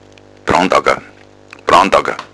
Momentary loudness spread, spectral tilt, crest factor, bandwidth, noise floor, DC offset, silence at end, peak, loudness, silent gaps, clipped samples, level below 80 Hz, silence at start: 13 LU; -4 dB/octave; 14 dB; 11 kHz; -40 dBFS; under 0.1%; 0.1 s; 0 dBFS; -13 LUFS; none; 0.3%; -42 dBFS; 0.45 s